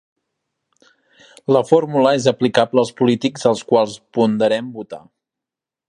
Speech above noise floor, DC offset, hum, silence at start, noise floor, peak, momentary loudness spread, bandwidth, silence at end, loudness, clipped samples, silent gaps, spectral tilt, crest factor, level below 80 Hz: 70 dB; under 0.1%; none; 1.5 s; -87 dBFS; 0 dBFS; 16 LU; 11 kHz; 0.9 s; -17 LUFS; under 0.1%; none; -5.5 dB/octave; 18 dB; -64 dBFS